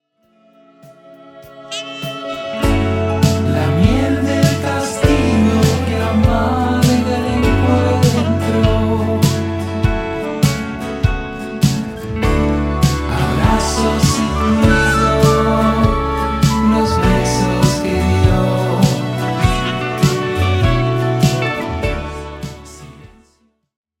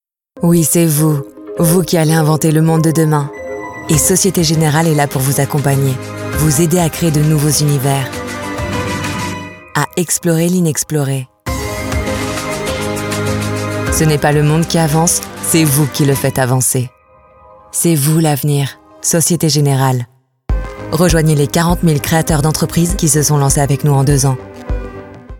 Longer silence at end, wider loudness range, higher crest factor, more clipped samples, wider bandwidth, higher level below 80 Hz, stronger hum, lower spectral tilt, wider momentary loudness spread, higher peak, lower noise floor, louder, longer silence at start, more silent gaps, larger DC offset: first, 0.95 s vs 0 s; about the same, 5 LU vs 4 LU; about the same, 16 dB vs 14 dB; neither; about the same, 17 kHz vs 18 kHz; about the same, -26 dBFS vs -30 dBFS; neither; about the same, -6 dB/octave vs -5 dB/octave; about the same, 9 LU vs 11 LU; about the same, 0 dBFS vs 0 dBFS; first, -59 dBFS vs -45 dBFS; about the same, -15 LUFS vs -13 LUFS; first, 0.85 s vs 0.35 s; neither; neither